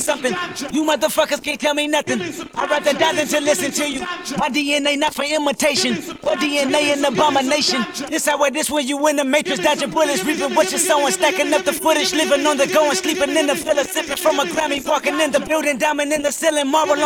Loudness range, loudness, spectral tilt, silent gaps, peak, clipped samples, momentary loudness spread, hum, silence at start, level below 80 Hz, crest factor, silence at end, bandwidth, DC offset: 2 LU; -18 LUFS; -2 dB/octave; none; -2 dBFS; under 0.1%; 5 LU; none; 0 s; -54 dBFS; 16 dB; 0 s; 19 kHz; under 0.1%